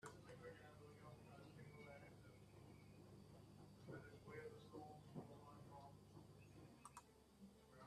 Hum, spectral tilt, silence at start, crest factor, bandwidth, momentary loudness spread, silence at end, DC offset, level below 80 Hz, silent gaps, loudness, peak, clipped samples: none; -6 dB/octave; 0 s; 20 dB; 13.5 kHz; 7 LU; 0 s; under 0.1%; -78 dBFS; none; -62 LUFS; -42 dBFS; under 0.1%